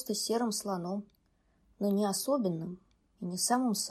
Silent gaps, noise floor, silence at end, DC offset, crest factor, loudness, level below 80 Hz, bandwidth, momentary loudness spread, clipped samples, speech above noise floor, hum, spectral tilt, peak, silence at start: none; -71 dBFS; 0 s; under 0.1%; 16 dB; -32 LUFS; -72 dBFS; 15.5 kHz; 12 LU; under 0.1%; 39 dB; none; -4 dB/octave; -16 dBFS; 0 s